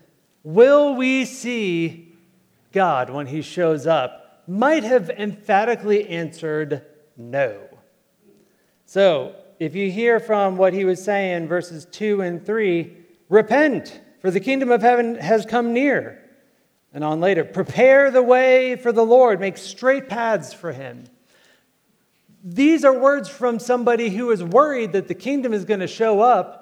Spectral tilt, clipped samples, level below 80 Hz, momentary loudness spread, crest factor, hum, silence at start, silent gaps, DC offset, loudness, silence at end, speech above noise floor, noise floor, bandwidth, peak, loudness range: -6 dB/octave; under 0.1%; -72 dBFS; 14 LU; 18 dB; none; 0.45 s; none; under 0.1%; -19 LUFS; 0.05 s; 46 dB; -64 dBFS; 12 kHz; -2 dBFS; 7 LU